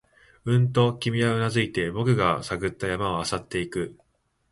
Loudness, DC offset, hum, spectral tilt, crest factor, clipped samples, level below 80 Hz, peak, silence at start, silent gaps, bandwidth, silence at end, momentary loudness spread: -25 LUFS; under 0.1%; none; -6 dB/octave; 18 dB; under 0.1%; -50 dBFS; -6 dBFS; 0.45 s; none; 11.5 kHz; 0.6 s; 8 LU